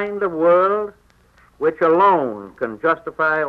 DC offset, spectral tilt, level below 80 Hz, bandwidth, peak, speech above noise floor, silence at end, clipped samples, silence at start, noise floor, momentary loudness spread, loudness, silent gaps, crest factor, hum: under 0.1%; -7.5 dB/octave; -58 dBFS; 5.2 kHz; -6 dBFS; 36 dB; 0 s; under 0.1%; 0 s; -53 dBFS; 13 LU; -18 LUFS; none; 14 dB; 60 Hz at -55 dBFS